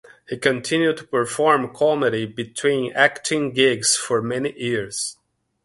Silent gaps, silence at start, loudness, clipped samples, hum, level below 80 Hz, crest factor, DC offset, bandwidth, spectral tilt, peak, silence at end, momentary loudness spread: none; 0.3 s; -20 LUFS; under 0.1%; none; -62 dBFS; 20 dB; under 0.1%; 11.5 kHz; -3 dB/octave; 0 dBFS; 0.5 s; 9 LU